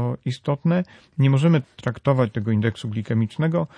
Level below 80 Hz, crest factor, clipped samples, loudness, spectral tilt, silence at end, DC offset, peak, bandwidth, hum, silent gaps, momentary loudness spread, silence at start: -58 dBFS; 14 dB; under 0.1%; -22 LUFS; -8.5 dB/octave; 0.1 s; under 0.1%; -6 dBFS; 9.8 kHz; none; none; 9 LU; 0 s